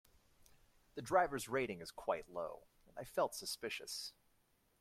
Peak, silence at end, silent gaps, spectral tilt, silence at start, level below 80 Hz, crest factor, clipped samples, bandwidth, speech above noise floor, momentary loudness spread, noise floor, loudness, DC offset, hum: -18 dBFS; 0.7 s; none; -3.5 dB/octave; 0.95 s; -70 dBFS; 24 dB; under 0.1%; 16 kHz; 36 dB; 17 LU; -76 dBFS; -41 LUFS; under 0.1%; none